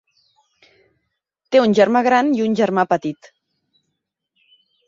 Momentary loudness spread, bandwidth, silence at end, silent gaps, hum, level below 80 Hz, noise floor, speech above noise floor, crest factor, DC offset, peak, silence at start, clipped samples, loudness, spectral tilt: 9 LU; 7.6 kHz; 1.75 s; none; none; -64 dBFS; -77 dBFS; 61 dB; 18 dB; under 0.1%; -2 dBFS; 1.5 s; under 0.1%; -17 LUFS; -6 dB/octave